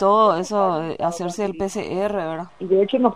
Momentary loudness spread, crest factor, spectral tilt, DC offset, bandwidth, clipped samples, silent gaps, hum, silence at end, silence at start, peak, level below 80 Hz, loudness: 9 LU; 18 dB; -5.5 dB/octave; 0.3%; 13 kHz; under 0.1%; none; none; 0 s; 0 s; -2 dBFS; -56 dBFS; -21 LUFS